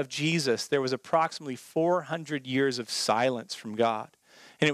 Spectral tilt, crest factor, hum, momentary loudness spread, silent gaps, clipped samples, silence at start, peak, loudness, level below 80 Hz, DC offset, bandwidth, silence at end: -4.5 dB/octave; 20 dB; none; 9 LU; none; under 0.1%; 0 s; -8 dBFS; -28 LUFS; -80 dBFS; under 0.1%; 15.5 kHz; 0 s